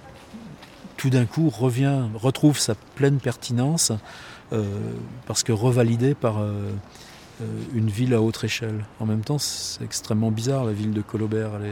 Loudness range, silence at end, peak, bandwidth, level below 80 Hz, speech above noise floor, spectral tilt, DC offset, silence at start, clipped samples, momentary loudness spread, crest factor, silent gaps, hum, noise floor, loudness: 3 LU; 0 s; -6 dBFS; 18 kHz; -56 dBFS; 20 dB; -5.5 dB/octave; under 0.1%; 0 s; under 0.1%; 19 LU; 18 dB; none; none; -43 dBFS; -24 LUFS